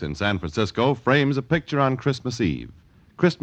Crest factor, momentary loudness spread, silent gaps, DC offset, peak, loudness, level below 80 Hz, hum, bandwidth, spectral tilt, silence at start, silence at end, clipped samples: 20 dB; 6 LU; none; under 0.1%; -4 dBFS; -23 LUFS; -46 dBFS; none; 8.6 kHz; -6.5 dB/octave; 0 s; 0.05 s; under 0.1%